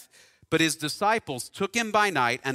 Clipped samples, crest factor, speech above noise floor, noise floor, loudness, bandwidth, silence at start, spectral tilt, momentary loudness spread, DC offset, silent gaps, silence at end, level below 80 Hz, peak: under 0.1%; 18 dB; 30 dB; -56 dBFS; -25 LUFS; 16 kHz; 0 s; -3 dB/octave; 6 LU; under 0.1%; none; 0 s; -66 dBFS; -8 dBFS